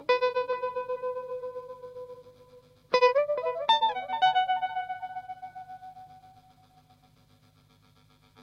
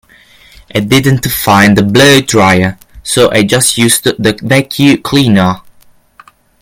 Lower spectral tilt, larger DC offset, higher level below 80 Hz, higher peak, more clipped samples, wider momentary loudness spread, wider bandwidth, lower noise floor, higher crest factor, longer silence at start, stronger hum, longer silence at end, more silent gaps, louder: second, -2.5 dB/octave vs -4.5 dB/octave; neither; second, -72 dBFS vs -38 dBFS; second, -12 dBFS vs 0 dBFS; second, under 0.1% vs 0.9%; first, 21 LU vs 9 LU; second, 8.6 kHz vs over 20 kHz; first, -61 dBFS vs -43 dBFS; first, 20 dB vs 10 dB; second, 0 s vs 0.75 s; first, 50 Hz at -75 dBFS vs none; second, 0 s vs 1 s; neither; second, -28 LUFS vs -8 LUFS